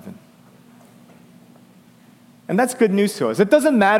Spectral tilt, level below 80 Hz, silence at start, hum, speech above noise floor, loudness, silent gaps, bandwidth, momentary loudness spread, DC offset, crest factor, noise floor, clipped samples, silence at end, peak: -5.5 dB/octave; -66 dBFS; 0.05 s; none; 33 dB; -18 LUFS; none; 16.5 kHz; 17 LU; under 0.1%; 18 dB; -50 dBFS; under 0.1%; 0 s; -2 dBFS